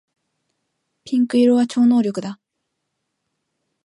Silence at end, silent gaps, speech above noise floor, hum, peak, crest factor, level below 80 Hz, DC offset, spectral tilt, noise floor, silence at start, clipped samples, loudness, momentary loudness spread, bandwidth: 1.5 s; none; 60 dB; none; -6 dBFS; 14 dB; -72 dBFS; under 0.1%; -6 dB/octave; -77 dBFS; 1.05 s; under 0.1%; -17 LUFS; 12 LU; 11 kHz